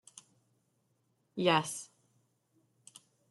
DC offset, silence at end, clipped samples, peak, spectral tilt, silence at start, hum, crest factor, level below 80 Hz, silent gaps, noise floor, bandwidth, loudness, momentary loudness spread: under 0.1%; 1.45 s; under 0.1%; -14 dBFS; -4 dB/octave; 1.35 s; none; 26 dB; -82 dBFS; none; -77 dBFS; 12.5 kHz; -32 LUFS; 24 LU